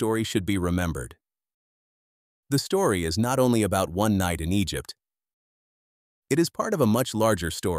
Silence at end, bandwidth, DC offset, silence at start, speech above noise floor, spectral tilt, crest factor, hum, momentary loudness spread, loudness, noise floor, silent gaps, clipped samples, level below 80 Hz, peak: 0 s; 16 kHz; under 0.1%; 0 s; over 66 dB; -5.5 dB/octave; 18 dB; none; 7 LU; -25 LUFS; under -90 dBFS; 1.54-2.43 s, 5.33-6.22 s; under 0.1%; -46 dBFS; -8 dBFS